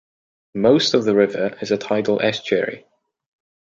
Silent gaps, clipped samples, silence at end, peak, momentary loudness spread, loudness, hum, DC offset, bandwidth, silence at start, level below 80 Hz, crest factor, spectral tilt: none; under 0.1%; 0.85 s; -2 dBFS; 10 LU; -19 LUFS; none; under 0.1%; 7.6 kHz; 0.55 s; -62 dBFS; 18 dB; -5 dB/octave